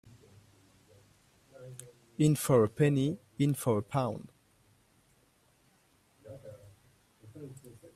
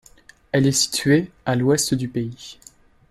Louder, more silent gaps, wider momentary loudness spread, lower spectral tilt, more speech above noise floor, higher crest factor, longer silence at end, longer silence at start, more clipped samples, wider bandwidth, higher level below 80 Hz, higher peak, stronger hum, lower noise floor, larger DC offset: second, -29 LUFS vs -20 LUFS; neither; first, 24 LU vs 13 LU; first, -6.5 dB/octave vs -4.5 dB/octave; first, 39 dB vs 30 dB; about the same, 22 dB vs 18 dB; second, 0.1 s vs 0.55 s; first, 1.6 s vs 0.55 s; neither; first, 15.5 kHz vs 13 kHz; second, -66 dBFS vs -54 dBFS; second, -12 dBFS vs -4 dBFS; neither; first, -68 dBFS vs -51 dBFS; neither